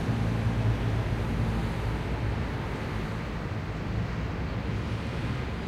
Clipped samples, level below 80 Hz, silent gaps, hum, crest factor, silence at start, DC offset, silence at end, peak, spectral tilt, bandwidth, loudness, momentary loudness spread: under 0.1%; -36 dBFS; none; none; 14 dB; 0 s; under 0.1%; 0 s; -16 dBFS; -7.5 dB/octave; 12.5 kHz; -31 LUFS; 6 LU